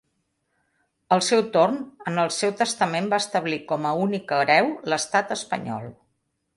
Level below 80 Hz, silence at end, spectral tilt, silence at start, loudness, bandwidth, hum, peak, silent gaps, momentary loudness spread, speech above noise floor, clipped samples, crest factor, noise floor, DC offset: -70 dBFS; 0.65 s; -4 dB/octave; 1.1 s; -23 LUFS; 11.5 kHz; none; -2 dBFS; none; 10 LU; 51 dB; under 0.1%; 22 dB; -74 dBFS; under 0.1%